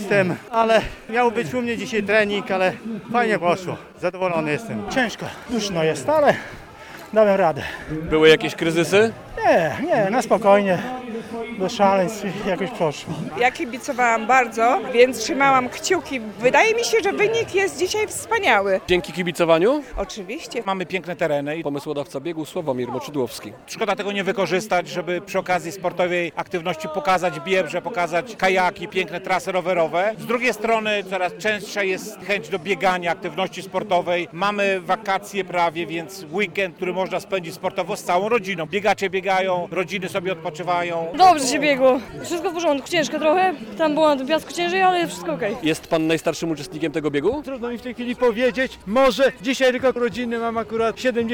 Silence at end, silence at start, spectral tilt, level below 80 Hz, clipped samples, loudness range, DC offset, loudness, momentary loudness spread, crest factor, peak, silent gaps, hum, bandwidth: 0 s; 0 s; -4.5 dB/octave; -52 dBFS; under 0.1%; 5 LU; under 0.1%; -21 LUFS; 10 LU; 18 dB; -2 dBFS; none; none; 18 kHz